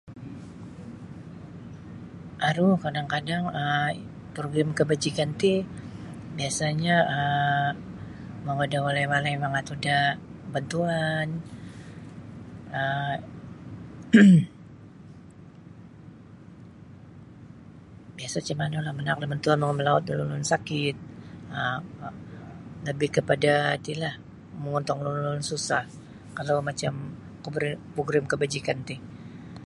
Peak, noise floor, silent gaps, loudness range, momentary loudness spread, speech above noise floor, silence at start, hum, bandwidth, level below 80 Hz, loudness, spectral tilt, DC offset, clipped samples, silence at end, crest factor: -4 dBFS; -47 dBFS; none; 7 LU; 21 LU; 22 dB; 0.05 s; none; 11.5 kHz; -58 dBFS; -26 LUFS; -5.5 dB/octave; under 0.1%; under 0.1%; 0 s; 22 dB